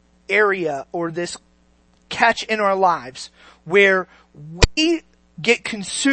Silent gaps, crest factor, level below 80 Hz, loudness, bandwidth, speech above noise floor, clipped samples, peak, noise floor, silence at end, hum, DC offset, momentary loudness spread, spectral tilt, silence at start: none; 20 dB; -32 dBFS; -19 LUFS; 8.8 kHz; 38 dB; under 0.1%; 0 dBFS; -57 dBFS; 0 s; none; under 0.1%; 19 LU; -3.5 dB/octave; 0.3 s